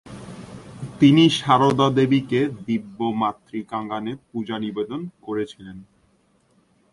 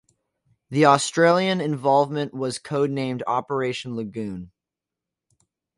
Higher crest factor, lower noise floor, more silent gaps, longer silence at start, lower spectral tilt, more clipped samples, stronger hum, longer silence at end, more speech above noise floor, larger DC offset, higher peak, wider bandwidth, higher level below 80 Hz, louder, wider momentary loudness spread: about the same, 20 dB vs 22 dB; second, -62 dBFS vs -87 dBFS; neither; second, 0.05 s vs 0.7 s; first, -6.5 dB/octave vs -5 dB/octave; neither; neither; second, 1.1 s vs 1.3 s; second, 41 dB vs 65 dB; neither; about the same, -2 dBFS vs -2 dBFS; about the same, 11.5 kHz vs 11.5 kHz; first, -58 dBFS vs -64 dBFS; about the same, -21 LUFS vs -22 LUFS; first, 22 LU vs 13 LU